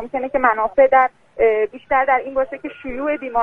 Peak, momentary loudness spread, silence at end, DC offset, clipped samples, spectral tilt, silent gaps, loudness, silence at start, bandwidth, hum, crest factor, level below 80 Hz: -2 dBFS; 12 LU; 0 s; under 0.1%; under 0.1%; -6.5 dB/octave; none; -18 LUFS; 0 s; 3.6 kHz; none; 16 dB; -48 dBFS